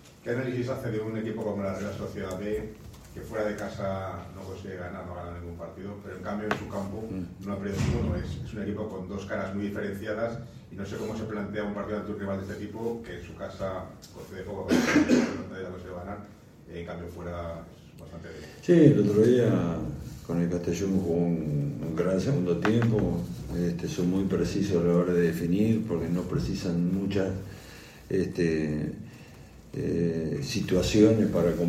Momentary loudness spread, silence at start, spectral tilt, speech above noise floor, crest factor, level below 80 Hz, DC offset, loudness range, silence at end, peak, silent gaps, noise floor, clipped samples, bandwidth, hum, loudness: 17 LU; 0.05 s; -7 dB/octave; 20 dB; 26 dB; -48 dBFS; under 0.1%; 10 LU; 0 s; -4 dBFS; none; -48 dBFS; under 0.1%; 15.5 kHz; none; -28 LUFS